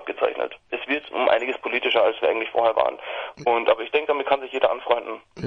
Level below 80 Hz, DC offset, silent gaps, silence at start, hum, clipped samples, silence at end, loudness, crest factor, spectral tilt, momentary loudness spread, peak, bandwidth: -64 dBFS; under 0.1%; none; 0 s; none; under 0.1%; 0 s; -23 LUFS; 20 dB; -5 dB/octave; 9 LU; -2 dBFS; 7.4 kHz